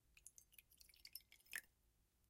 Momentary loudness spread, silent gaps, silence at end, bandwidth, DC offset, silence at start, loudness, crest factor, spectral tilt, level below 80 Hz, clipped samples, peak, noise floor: 13 LU; none; 0 s; 16.5 kHz; under 0.1%; 0 s; -58 LUFS; 34 dB; 1 dB/octave; -82 dBFS; under 0.1%; -28 dBFS; -81 dBFS